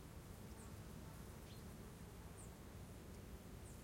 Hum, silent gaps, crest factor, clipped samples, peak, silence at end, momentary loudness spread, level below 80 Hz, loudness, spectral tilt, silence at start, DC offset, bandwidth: none; none; 12 dB; under 0.1%; -42 dBFS; 0 s; 1 LU; -62 dBFS; -57 LUFS; -5 dB/octave; 0 s; under 0.1%; 16.5 kHz